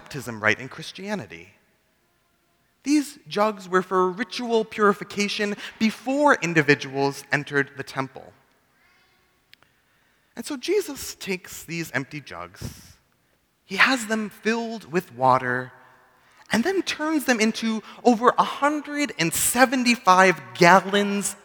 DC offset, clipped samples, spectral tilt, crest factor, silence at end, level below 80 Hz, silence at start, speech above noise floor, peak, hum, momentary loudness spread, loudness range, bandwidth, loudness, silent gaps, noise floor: under 0.1%; under 0.1%; -4 dB/octave; 24 dB; 0.1 s; -62 dBFS; 0.1 s; 43 dB; 0 dBFS; none; 16 LU; 11 LU; over 20 kHz; -22 LUFS; none; -66 dBFS